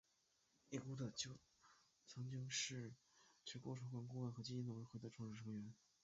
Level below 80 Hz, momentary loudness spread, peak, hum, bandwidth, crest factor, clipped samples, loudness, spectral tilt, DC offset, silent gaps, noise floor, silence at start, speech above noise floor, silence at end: -82 dBFS; 13 LU; -32 dBFS; none; 7.6 kHz; 20 dB; under 0.1%; -51 LUFS; -5 dB/octave; under 0.1%; none; -83 dBFS; 0.7 s; 32 dB; 0.3 s